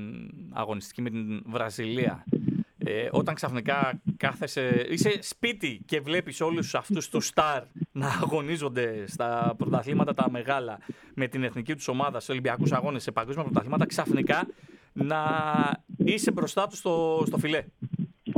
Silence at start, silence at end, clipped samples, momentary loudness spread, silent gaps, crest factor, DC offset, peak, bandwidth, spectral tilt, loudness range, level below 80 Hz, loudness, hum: 0 s; 0 s; under 0.1%; 8 LU; none; 20 dB; under 0.1%; -8 dBFS; 17.5 kHz; -5.5 dB/octave; 2 LU; -64 dBFS; -28 LUFS; none